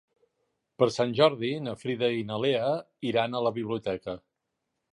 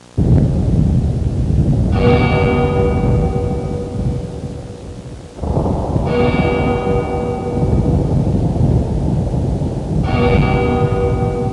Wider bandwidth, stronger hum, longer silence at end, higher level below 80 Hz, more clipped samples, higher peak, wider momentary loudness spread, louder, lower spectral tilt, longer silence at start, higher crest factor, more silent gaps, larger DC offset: about the same, 11 kHz vs 11 kHz; neither; first, 0.75 s vs 0 s; second, -66 dBFS vs -24 dBFS; neither; second, -8 dBFS vs -2 dBFS; about the same, 10 LU vs 9 LU; second, -28 LUFS vs -16 LUFS; second, -6 dB/octave vs -8.5 dB/octave; first, 0.8 s vs 0.15 s; first, 22 dB vs 12 dB; neither; second, under 0.1% vs 0.2%